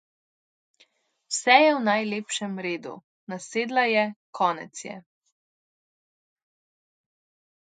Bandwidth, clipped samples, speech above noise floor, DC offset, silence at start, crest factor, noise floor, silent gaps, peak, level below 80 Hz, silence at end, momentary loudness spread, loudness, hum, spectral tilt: 9.6 kHz; under 0.1%; 40 dB; under 0.1%; 1.3 s; 26 dB; -64 dBFS; 3.04-3.27 s, 4.16-4.33 s; -2 dBFS; -82 dBFS; 2.7 s; 21 LU; -24 LUFS; none; -3 dB/octave